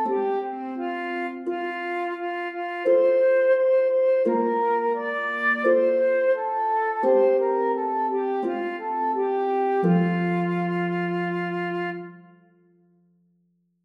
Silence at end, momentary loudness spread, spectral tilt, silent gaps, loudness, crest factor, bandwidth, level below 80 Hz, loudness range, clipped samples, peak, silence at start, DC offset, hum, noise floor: 1.65 s; 10 LU; -9 dB/octave; none; -23 LUFS; 14 dB; 5.6 kHz; -82 dBFS; 5 LU; under 0.1%; -8 dBFS; 0 s; under 0.1%; none; -68 dBFS